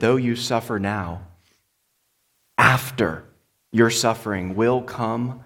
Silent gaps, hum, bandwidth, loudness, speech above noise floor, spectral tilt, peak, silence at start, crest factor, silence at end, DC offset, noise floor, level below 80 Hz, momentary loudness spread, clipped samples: none; none; 17.5 kHz; -21 LUFS; 48 dB; -5 dB/octave; -2 dBFS; 0 s; 22 dB; 0 s; under 0.1%; -70 dBFS; -54 dBFS; 11 LU; under 0.1%